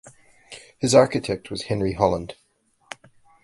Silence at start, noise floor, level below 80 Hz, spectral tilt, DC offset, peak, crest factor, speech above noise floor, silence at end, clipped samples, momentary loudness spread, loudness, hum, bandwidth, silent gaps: 0.05 s; -55 dBFS; -48 dBFS; -5 dB/octave; under 0.1%; -2 dBFS; 22 dB; 34 dB; 1.1 s; under 0.1%; 25 LU; -22 LUFS; none; 11.5 kHz; none